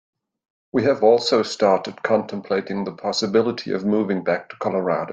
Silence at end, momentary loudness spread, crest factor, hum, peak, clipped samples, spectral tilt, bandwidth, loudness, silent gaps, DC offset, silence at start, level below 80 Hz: 0 s; 8 LU; 18 dB; none; -4 dBFS; under 0.1%; -5 dB/octave; 9 kHz; -21 LUFS; none; under 0.1%; 0.75 s; -64 dBFS